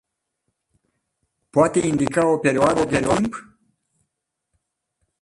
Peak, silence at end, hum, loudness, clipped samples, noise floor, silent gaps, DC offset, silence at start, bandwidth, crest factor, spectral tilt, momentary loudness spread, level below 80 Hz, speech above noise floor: -2 dBFS; 1.8 s; none; -20 LUFS; under 0.1%; -79 dBFS; none; under 0.1%; 1.55 s; 11.5 kHz; 20 dB; -5.5 dB/octave; 6 LU; -50 dBFS; 60 dB